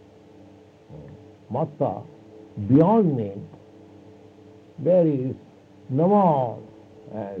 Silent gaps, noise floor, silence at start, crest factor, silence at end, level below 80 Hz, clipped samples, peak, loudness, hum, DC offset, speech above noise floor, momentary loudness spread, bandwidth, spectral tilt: none; -49 dBFS; 0.9 s; 18 dB; 0 s; -66 dBFS; under 0.1%; -6 dBFS; -22 LUFS; none; under 0.1%; 28 dB; 24 LU; 4.9 kHz; -11 dB/octave